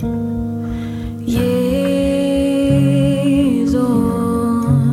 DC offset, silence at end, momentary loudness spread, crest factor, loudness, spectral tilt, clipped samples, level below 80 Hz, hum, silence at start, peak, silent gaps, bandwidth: under 0.1%; 0 s; 9 LU; 14 dB; -16 LUFS; -7.5 dB/octave; under 0.1%; -34 dBFS; none; 0 s; -2 dBFS; none; 15 kHz